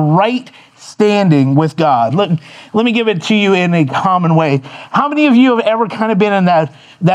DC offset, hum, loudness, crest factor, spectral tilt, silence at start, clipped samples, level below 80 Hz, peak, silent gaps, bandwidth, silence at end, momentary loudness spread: under 0.1%; none; -12 LUFS; 12 dB; -7 dB/octave; 0 s; under 0.1%; -62 dBFS; 0 dBFS; none; 9.6 kHz; 0 s; 7 LU